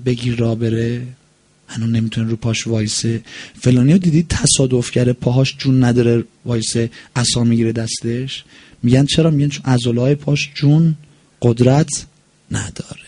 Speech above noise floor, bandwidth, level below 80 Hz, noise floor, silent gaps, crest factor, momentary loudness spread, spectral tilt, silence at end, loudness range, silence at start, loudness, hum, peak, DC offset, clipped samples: 38 dB; 11 kHz; -42 dBFS; -54 dBFS; none; 16 dB; 11 LU; -5.5 dB/octave; 0.05 s; 3 LU; 0 s; -16 LUFS; none; 0 dBFS; under 0.1%; under 0.1%